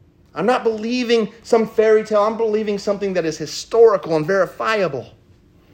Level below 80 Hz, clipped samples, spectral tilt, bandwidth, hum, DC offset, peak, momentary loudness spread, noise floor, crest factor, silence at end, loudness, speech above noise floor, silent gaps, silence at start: -58 dBFS; under 0.1%; -5 dB/octave; 15.5 kHz; none; under 0.1%; -2 dBFS; 9 LU; -51 dBFS; 16 dB; 0.65 s; -18 LUFS; 33 dB; none; 0.35 s